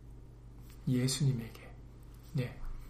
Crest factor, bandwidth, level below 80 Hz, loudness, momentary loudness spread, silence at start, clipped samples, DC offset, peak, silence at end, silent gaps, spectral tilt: 16 dB; 15.5 kHz; -48 dBFS; -35 LUFS; 23 LU; 0 s; under 0.1%; under 0.1%; -20 dBFS; 0 s; none; -5.5 dB/octave